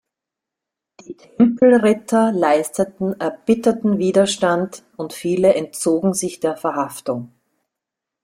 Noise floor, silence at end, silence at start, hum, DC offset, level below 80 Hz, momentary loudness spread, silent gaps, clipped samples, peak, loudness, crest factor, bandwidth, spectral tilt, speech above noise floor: -85 dBFS; 1 s; 1.1 s; none; under 0.1%; -60 dBFS; 12 LU; none; under 0.1%; -2 dBFS; -18 LUFS; 16 dB; 16 kHz; -5 dB/octave; 67 dB